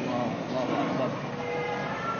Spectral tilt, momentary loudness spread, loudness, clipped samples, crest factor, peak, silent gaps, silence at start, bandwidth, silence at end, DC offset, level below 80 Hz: -6 dB/octave; 3 LU; -30 LUFS; under 0.1%; 14 dB; -16 dBFS; none; 0 s; 7 kHz; 0 s; under 0.1%; -62 dBFS